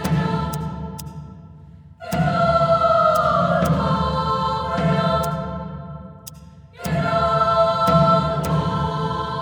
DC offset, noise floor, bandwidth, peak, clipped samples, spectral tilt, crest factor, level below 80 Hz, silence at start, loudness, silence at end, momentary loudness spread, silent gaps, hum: under 0.1%; -43 dBFS; 19 kHz; -4 dBFS; under 0.1%; -6.5 dB/octave; 16 dB; -38 dBFS; 0 s; -19 LUFS; 0 s; 19 LU; none; none